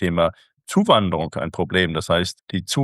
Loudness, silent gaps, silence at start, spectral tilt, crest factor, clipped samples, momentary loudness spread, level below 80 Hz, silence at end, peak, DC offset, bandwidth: -21 LUFS; 2.43-2.47 s; 0 s; -5 dB/octave; 18 dB; under 0.1%; 9 LU; -46 dBFS; 0 s; -2 dBFS; under 0.1%; 12.5 kHz